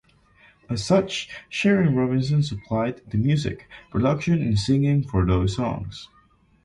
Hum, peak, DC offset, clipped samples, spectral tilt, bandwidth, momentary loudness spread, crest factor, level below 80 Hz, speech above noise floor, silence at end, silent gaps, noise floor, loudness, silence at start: none; -6 dBFS; under 0.1%; under 0.1%; -7 dB/octave; 11 kHz; 11 LU; 16 dB; -40 dBFS; 34 dB; 0.6 s; none; -56 dBFS; -23 LUFS; 0.7 s